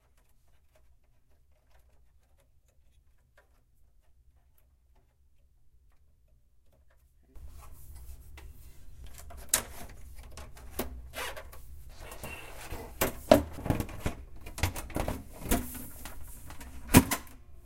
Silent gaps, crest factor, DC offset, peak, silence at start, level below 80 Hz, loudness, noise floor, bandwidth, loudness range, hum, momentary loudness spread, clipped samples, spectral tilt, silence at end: none; 34 dB; under 0.1%; -2 dBFS; 1.8 s; -46 dBFS; -31 LUFS; -64 dBFS; 16.5 kHz; 23 LU; none; 27 LU; under 0.1%; -4.5 dB/octave; 0 s